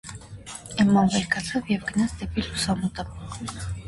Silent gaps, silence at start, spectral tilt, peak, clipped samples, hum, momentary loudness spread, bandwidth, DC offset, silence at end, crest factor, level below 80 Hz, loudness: none; 0.05 s; -5 dB/octave; -8 dBFS; under 0.1%; none; 17 LU; 11.5 kHz; under 0.1%; 0 s; 18 dB; -44 dBFS; -25 LUFS